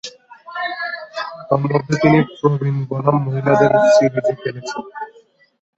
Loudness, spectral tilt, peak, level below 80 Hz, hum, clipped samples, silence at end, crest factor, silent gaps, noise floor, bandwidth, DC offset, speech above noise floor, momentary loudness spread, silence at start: -17 LUFS; -7 dB/octave; -2 dBFS; -54 dBFS; none; under 0.1%; 0.7 s; 16 dB; none; -37 dBFS; 8 kHz; under 0.1%; 21 dB; 16 LU; 0.05 s